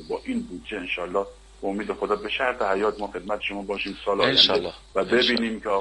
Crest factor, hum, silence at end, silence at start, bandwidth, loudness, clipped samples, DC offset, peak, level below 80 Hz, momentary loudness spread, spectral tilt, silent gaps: 22 dB; none; 0 s; 0 s; 11 kHz; -24 LUFS; under 0.1%; under 0.1%; -2 dBFS; -50 dBFS; 13 LU; -4 dB/octave; none